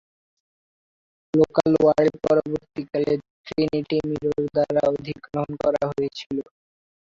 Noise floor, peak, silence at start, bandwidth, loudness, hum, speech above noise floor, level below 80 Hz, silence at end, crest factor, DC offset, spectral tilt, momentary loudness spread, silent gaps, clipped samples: under -90 dBFS; -4 dBFS; 1.35 s; 7.6 kHz; -23 LUFS; none; over 68 dB; -54 dBFS; 0.6 s; 20 dB; under 0.1%; -7.5 dB/octave; 12 LU; 3.30-3.44 s, 6.26-6.30 s; under 0.1%